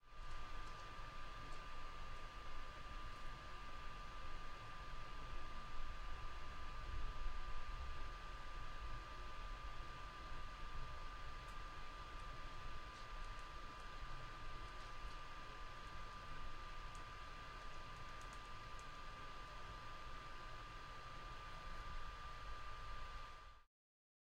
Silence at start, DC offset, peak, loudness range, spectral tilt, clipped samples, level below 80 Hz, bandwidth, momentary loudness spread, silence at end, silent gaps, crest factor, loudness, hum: 0.05 s; under 0.1%; -32 dBFS; 2 LU; -4 dB/octave; under 0.1%; -52 dBFS; 9.6 kHz; 2 LU; 0.75 s; none; 18 dB; -54 LUFS; none